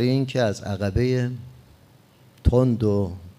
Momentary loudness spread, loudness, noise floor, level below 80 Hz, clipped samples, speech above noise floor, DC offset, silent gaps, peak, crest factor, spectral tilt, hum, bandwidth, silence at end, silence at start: 7 LU; -23 LUFS; -54 dBFS; -36 dBFS; under 0.1%; 32 dB; under 0.1%; none; -6 dBFS; 18 dB; -7.5 dB/octave; none; 12 kHz; 0.1 s; 0 s